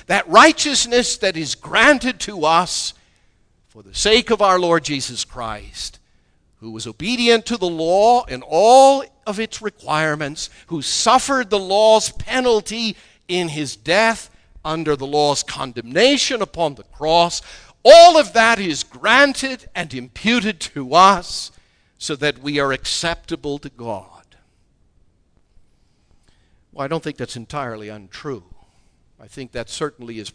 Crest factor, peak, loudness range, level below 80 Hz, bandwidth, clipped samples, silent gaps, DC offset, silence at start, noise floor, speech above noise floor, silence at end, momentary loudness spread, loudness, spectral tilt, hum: 18 dB; 0 dBFS; 17 LU; -46 dBFS; 11 kHz; under 0.1%; none; under 0.1%; 0.1 s; -59 dBFS; 42 dB; 0.05 s; 18 LU; -16 LUFS; -3 dB/octave; none